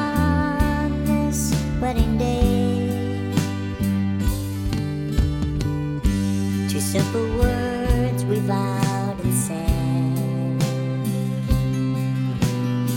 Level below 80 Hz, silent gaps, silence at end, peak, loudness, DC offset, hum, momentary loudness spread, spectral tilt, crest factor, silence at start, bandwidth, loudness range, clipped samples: -30 dBFS; none; 0 s; -6 dBFS; -22 LUFS; under 0.1%; none; 4 LU; -6.5 dB/octave; 16 dB; 0 s; 17 kHz; 2 LU; under 0.1%